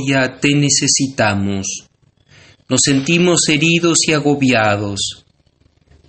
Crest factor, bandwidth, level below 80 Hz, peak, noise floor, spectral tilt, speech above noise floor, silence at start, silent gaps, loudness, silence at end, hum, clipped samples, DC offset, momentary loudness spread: 16 dB; 9 kHz; -50 dBFS; 0 dBFS; -56 dBFS; -3.5 dB/octave; 42 dB; 0 s; none; -14 LUFS; 0.95 s; none; under 0.1%; under 0.1%; 9 LU